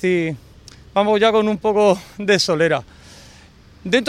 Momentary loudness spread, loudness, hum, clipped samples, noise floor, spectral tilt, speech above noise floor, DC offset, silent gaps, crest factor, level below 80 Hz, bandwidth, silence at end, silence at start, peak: 9 LU; -18 LUFS; none; under 0.1%; -46 dBFS; -4.5 dB/octave; 29 dB; under 0.1%; none; 16 dB; -52 dBFS; 14.5 kHz; 0 s; 0 s; -2 dBFS